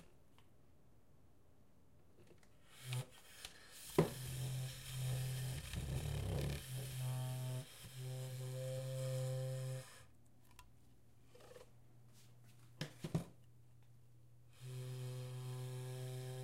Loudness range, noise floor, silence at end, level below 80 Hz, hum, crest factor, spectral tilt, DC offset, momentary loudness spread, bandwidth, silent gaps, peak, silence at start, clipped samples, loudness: 11 LU; -70 dBFS; 0 s; -60 dBFS; none; 28 dB; -5.5 dB/octave; under 0.1%; 22 LU; 16 kHz; none; -18 dBFS; 0 s; under 0.1%; -45 LUFS